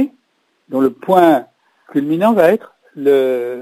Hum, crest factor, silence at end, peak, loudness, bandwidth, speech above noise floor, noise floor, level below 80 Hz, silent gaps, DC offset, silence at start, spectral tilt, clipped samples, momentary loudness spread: none; 16 dB; 0 s; 0 dBFS; -15 LUFS; 16 kHz; 50 dB; -63 dBFS; -66 dBFS; none; under 0.1%; 0 s; -7 dB/octave; under 0.1%; 10 LU